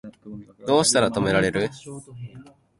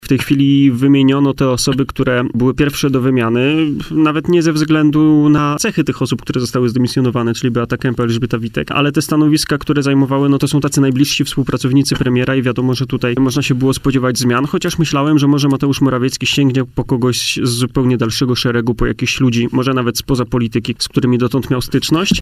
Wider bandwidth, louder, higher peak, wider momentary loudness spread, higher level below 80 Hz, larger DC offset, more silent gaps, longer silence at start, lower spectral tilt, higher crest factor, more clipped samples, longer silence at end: second, 11.5 kHz vs 15.5 kHz; second, -21 LUFS vs -14 LUFS; second, -4 dBFS vs 0 dBFS; first, 23 LU vs 6 LU; second, -52 dBFS vs -36 dBFS; neither; neither; about the same, 0.05 s vs 0.05 s; second, -3.5 dB/octave vs -5.5 dB/octave; first, 20 dB vs 14 dB; neither; first, 0.35 s vs 0 s